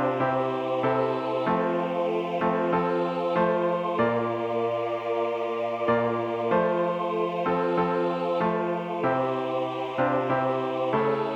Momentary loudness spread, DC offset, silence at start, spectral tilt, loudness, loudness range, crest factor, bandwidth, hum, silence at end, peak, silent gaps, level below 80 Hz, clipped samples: 3 LU; under 0.1%; 0 s; -8 dB/octave; -26 LUFS; 1 LU; 14 dB; 7.8 kHz; none; 0 s; -10 dBFS; none; -64 dBFS; under 0.1%